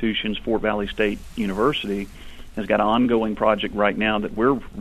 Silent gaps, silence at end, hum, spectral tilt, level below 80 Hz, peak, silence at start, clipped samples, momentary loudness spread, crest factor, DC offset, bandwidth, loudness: none; 0 s; none; -6 dB/octave; -40 dBFS; -4 dBFS; 0 s; under 0.1%; 9 LU; 18 dB; under 0.1%; 13.5 kHz; -22 LUFS